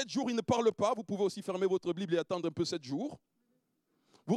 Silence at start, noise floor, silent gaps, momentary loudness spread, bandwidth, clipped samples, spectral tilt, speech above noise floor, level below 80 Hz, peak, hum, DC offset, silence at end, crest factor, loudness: 0 s; -78 dBFS; none; 8 LU; 12 kHz; under 0.1%; -5.5 dB/octave; 45 dB; -78 dBFS; -16 dBFS; none; under 0.1%; 0 s; 18 dB; -34 LUFS